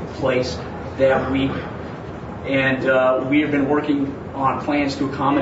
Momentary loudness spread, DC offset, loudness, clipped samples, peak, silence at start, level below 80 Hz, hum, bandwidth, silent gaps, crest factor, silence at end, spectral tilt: 13 LU; under 0.1%; -20 LUFS; under 0.1%; -4 dBFS; 0 s; -44 dBFS; none; 8 kHz; none; 16 dB; 0 s; -6.5 dB/octave